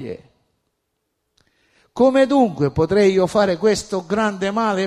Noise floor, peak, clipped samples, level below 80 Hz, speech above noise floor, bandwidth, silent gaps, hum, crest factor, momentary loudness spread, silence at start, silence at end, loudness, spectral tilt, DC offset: -74 dBFS; -4 dBFS; under 0.1%; -48 dBFS; 57 dB; 14 kHz; none; none; 16 dB; 8 LU; 0 s; 0 s; -18 LUFS; -6 dB/octave; under 0.1%